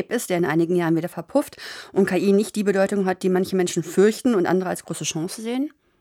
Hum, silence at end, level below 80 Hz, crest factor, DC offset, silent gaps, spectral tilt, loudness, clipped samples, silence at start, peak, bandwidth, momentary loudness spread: none; 0.3 s; -66 dBFS; 16 dB; under 0.1%; none; -5.5 dB/octave; -22 LUFS; under 0.1%; 0 s; -6 dBFS; 16.5 kHz; 8 LU